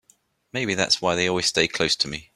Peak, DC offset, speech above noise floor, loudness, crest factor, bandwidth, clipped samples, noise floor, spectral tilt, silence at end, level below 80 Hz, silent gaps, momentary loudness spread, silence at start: -4 dBFS; under 0.1%; 39 dB; -22 LUFS; 20 dB; 15.5 kHz; under 0.1%; -62 dBFS; -2.5 dB/octave; 0.15 s; -56 dBFS; none; 6 LU; 0.55 s